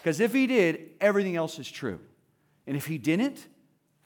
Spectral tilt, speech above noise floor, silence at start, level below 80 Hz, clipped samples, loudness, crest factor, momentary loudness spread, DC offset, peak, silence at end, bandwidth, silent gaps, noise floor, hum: -5.5 dB/octave; 41 dB; 0.05 s; -76 dBFS; under 0.1%; -27 LUFS; 18 dB; 13 LU; under 0.1%; -10 dBFS; 0.6 s; over 20 kHz; none; -68 dBFS; none